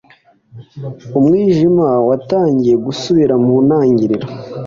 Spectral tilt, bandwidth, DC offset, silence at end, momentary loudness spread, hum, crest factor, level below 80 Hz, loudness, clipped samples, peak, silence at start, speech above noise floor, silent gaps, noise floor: -8 dB/octave; 7.4 kHz; under 0.1%; 0 s; 11 LU; none; 10 dB; -50 dBFS; -13 LUFS; under 0.1%; -2 dBFS; 0.55 s; 37 dB; none; -49 dBFS